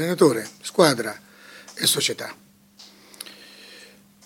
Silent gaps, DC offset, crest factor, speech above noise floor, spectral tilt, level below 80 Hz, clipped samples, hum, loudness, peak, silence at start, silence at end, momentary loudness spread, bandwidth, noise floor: none; under 0.1%; 22 dB; 29 dB; -3.5 dB/octave; -72 dBFS; under 0.1%; none; -21 LUFS; -2 dBFS; 0 s; 0.4 s; 24 LU; 17 kHz; -50 dBFS